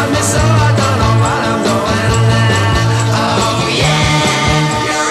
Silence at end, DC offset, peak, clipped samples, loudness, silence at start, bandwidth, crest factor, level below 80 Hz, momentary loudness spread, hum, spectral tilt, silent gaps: 0 s; under 0.1%; 0 dBFS; under 0.1%; -12 LUFS; 0 s; 14 kHz; 12 dB; -28 dBFS; 3 LU; none; -4.5 dB/octave; none